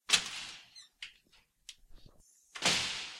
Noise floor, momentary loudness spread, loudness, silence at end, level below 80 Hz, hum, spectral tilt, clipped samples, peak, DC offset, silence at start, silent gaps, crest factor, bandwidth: -68 dBFS; 24 LU; -32 LUFS; 0 s; -66 dBFS; none; 0 dB/octave; under 0.1%; -8 dBFS; under 0.1%; 0.1 s; none; 30 dB; 16 kHz